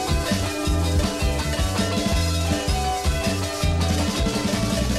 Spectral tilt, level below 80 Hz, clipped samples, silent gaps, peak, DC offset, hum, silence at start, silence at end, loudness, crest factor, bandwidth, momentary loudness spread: -4.5 dB/octave; -28 dBFS; under 0.1%; none; -8 dBFS; under 0.1%; none; 0 s; 0 s; -23 LUFS; 14 dB; 15.5 kHz; 2 LU